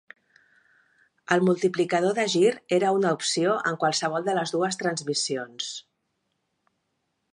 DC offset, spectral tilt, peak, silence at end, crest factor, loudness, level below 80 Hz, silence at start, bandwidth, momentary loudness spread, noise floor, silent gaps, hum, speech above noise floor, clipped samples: under 0.1%; -4 dB/octave; -4 dBFS; 1.55 s; 22 dB; -25 LUFS; -76 dBFS; 1.3 s; 11.5 kHz; 8 LU; -77 dBFS; none; none; 52 dB; under 0.1%